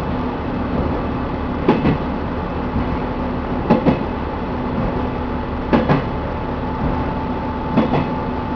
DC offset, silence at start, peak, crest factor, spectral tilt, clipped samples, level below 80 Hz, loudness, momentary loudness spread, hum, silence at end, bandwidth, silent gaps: under 0.1%; 0 s; 0 dBFS; 20 dB; -9.5 dB/octave; under 0.1%; -28 dBFS; -20 LUFS; 7 LU; none; 0 s; 5.4 kHz; none